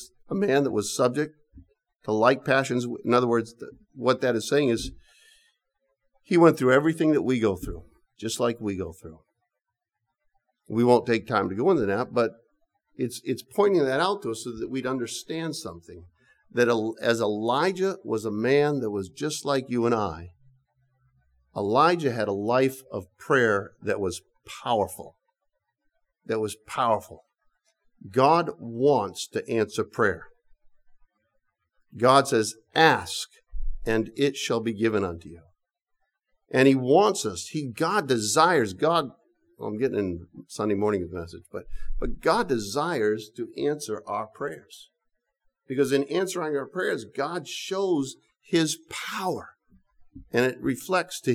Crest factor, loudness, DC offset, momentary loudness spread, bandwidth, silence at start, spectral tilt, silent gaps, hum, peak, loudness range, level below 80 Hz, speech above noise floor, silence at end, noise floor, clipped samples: 22 dB; -25 LUFS; under 0.1%; 15 LU; 16 kHz; 0 s; -5 dB/octave; none; none; -4 dBFS; 6 LU; -48 dBFS; 59 dB; 0 s; -84 dBFS; under 0.1%